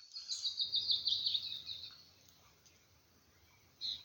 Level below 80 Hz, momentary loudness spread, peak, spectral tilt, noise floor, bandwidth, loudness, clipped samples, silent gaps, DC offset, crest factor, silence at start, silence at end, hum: -78 dBFS; 14 LU; -22 dBFS; 1 dB/octave; -69 dBFS; 17 kHz; -36 LUFS; under 0.1%; none; under 0.1%; 20 dB; 0 s; 0 s; none